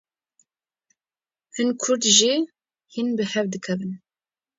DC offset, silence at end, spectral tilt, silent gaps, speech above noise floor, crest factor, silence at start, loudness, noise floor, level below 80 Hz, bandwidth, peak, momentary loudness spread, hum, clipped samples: under 0.1%; 0.6 s; -2.5 dB/octave; none; over 68 dB; 24 dB; 1.55 s; -21 LUFS; under -90 dBFS; -72 dBFS; 7.8 kHz; -2 dBFS; 19 LU; none; under 0.1%